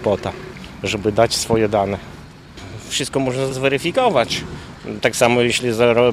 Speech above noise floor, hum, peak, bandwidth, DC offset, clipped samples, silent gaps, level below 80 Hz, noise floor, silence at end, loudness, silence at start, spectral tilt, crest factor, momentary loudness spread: 20 dB; none; 0 dBFS; 16 kHz; under 0.1%; under 0.1%; none; -44 dBFS; -38 dBFS; 0 s; -18 LUFS; 0 s; -4 dB/octave; 18 dB; 18 LU